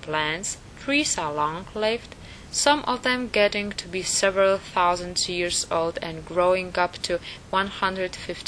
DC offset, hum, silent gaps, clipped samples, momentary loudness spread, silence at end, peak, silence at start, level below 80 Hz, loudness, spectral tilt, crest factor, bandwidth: under 0.1%; none; none; under 0.1%; 9 LU; 0 s; -4 dBFS; 0 s; -50 dBFS; -24 LUFS; -2.5 dB/octave; 22 dB; 11 kHz